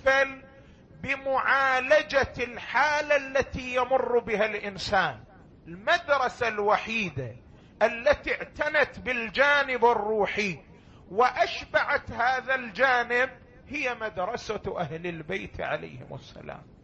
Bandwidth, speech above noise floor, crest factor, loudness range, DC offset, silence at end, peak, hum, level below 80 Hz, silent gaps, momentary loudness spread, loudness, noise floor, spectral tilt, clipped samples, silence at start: 8.4 kHz; 25 dB; 18 dB; 3 LU; under 0.1%; 0.2 s; -8 dBFS; none; -54 dBFS; none; 13 LU; -26 LUFS; -52 dBFS; -4 dB/octave; under 0.1%; 0 s